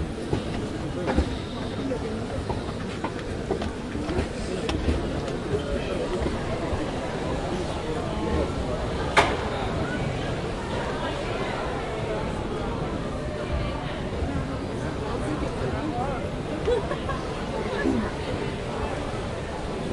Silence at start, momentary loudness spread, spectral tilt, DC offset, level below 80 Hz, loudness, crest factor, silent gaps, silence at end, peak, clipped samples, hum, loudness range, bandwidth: 0 s; 5 LU; -6 dB/octave; under 0.1%; -36 dBFS; -29 LUFS; 24 dB; none; 0 s; -4 dBFS; under 0.1%; none; 3 LU; 11.5 kHz